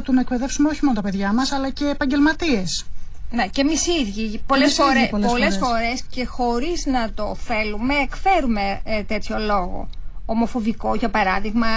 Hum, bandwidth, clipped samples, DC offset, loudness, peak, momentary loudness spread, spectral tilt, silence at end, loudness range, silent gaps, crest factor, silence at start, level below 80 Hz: none; 8 kHz; under 0.1%; under 0.1%; -21 LUFS; -6 dBFS; 9 LU; -4 dB/octave; 0 s; 3 LU; none; 14 dB; 0 s; -34 dBFS